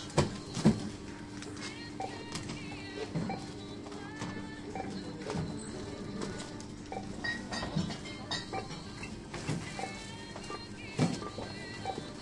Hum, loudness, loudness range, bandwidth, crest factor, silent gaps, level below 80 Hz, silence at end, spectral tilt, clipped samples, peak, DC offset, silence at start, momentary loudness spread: none; -38 LUFS; 4 LU; 11.5 kHz; 26 dB; none; -56 dBFS; 0 s; -5 dB/octave; under 0.1%; -12 dBFS; under 0.1%; 0 s; 10 LU